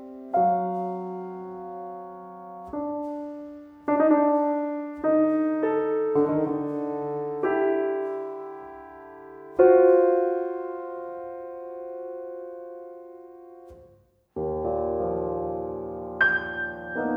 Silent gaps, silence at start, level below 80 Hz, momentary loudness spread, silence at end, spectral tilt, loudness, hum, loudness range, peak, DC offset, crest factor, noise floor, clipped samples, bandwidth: none; 0 s; -56 dBFS; 20 LU; 0 s; -9 dB/octave; -25 LUFS; none; 12 LU; -6 dBFS; under 0.1%; 20 dB; -59 dBFS; under 0.1%; 5.2 kHz